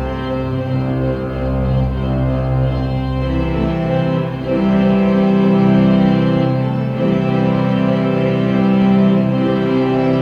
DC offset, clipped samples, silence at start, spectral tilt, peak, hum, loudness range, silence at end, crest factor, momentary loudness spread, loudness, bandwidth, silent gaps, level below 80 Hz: under 0.1%; under 0.1%; 0 s; -9.5 dB/octave; -2 dBFS; none; 4 LU; 0 s; 12 dB; 7 LU; -16 LUFS; 5.6 kHz; none; -28 dBFS